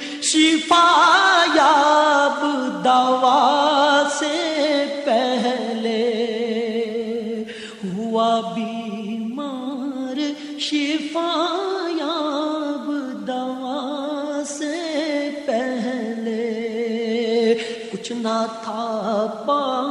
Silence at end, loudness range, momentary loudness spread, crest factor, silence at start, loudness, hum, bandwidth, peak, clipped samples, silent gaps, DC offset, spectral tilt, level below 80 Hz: 0 s; 9 LU; 13 LU; 16 dB; 0 s; -20 LUFS; none; 11.5 kHz; -4 dBFS; under 0.1%; none; under 0.1%; -3 dB/octave; -72 dBFS